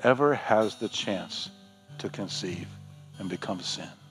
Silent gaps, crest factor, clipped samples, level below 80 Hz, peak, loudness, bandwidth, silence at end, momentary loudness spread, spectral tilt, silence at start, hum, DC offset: none; 22 dB; under 0.1%; -78 dBFS; -8 dBFS; -30 LUFS; 13.5 kHz; 0 s; 17 LU; -4.5 dB/octave; 0 s; none; under 0.1%